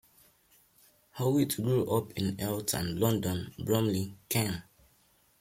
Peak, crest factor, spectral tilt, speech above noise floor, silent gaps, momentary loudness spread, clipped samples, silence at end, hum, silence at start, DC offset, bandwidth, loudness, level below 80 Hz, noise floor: -12 dBFS; 20 dB; -5.5 dB/octave; 37 dB; none; 7 LU; under 0.1%; 0.8 s; none; 1.15 s; under 0.1%; 16.5 kHz; -31 LUFS; -60 dBFS; -67 dBFS